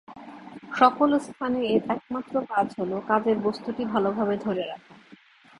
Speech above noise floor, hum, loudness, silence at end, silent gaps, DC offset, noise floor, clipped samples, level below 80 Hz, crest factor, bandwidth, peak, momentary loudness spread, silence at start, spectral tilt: 28 dB; none; -25 LUFS; 0.85 s; none; under 0.1%; -53 dBFS; under 0.1%; -64 dBFS; 22 dB; 11.5 kHz; -4 dBFS; 17 LU; 0.1 s; -6.5 dB/octave